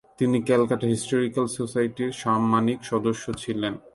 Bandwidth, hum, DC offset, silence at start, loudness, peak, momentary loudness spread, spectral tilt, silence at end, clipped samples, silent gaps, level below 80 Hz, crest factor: 11.5 kHz; none; under 0.1%; 0.2 s; -25 LUFS; -8 dBFS; 7 LU; -6 dB/octave; 0.05 s; under 0.1%; none; -58 dBFS; 16 dB